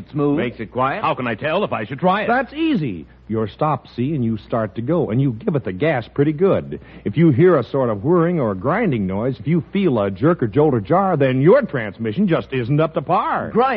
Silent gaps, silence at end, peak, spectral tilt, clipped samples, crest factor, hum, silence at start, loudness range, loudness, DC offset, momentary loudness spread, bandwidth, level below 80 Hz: none; 0 s; -2 dBFS; -6.5 dB/octave; under 0.1%; 16 dB; none; 0 s; 4 LU; -19 LUFS; under 0.1%; 8 LU; 5.4 kHz; -48 dBFS